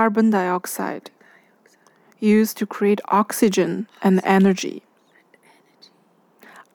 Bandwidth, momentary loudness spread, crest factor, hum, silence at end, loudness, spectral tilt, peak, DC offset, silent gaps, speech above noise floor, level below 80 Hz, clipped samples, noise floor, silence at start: over 20 kHz; 11 LU; 18 dB; none; 0.15 s; -20 LUFS; -6 dB/octave; -4 dBFS; under 0.1%; none; 40 dB; -74 dBFS; under 0.1%; -59 dBFS; 0 s